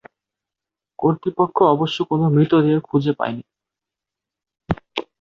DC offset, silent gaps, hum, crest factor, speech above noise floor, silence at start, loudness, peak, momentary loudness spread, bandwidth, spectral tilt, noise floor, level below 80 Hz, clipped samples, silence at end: under 0.1%; none; none; 18 dB; 69 dB; 1 s; -19 LUFS; -2 dBFS; 12 LU; 7 kHz; -8.5 dB/octave; -87 dBFS; -50 dBFS; under 0.1%; 0.2 s